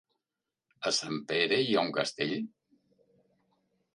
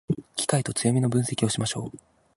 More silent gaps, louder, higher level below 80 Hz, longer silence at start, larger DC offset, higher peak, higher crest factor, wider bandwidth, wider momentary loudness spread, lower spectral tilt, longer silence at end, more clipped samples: neither; second, -30 LUFS vs -26 LUFS; second, -80 dBFS vs -56 dBFS; first, 0.8 s vs 0.1 s; neither; second, -12 dBFS vs -8 dBFS; about the same, 22 dB vs 18 dB; about the same, 11.5 kHz vs 11.5 kHz; about the same, 10 LU vs 8 LU; second, -3.5 dB/octave vs -5 dB/octave; first, 1.45 s vs 0.4 s; neither